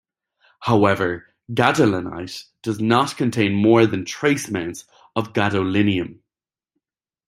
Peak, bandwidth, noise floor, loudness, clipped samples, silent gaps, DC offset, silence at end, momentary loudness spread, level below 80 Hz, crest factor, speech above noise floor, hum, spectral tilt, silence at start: -2 dBFS; 15.5 kHz; -89 dBFS; -20 LUFS; under 0.1%; none; under 0.1%; 1.15 s; 14 LU; -58 dBFS; 18 dB; 70 dB; none; -6 dB/octave; 0.6 s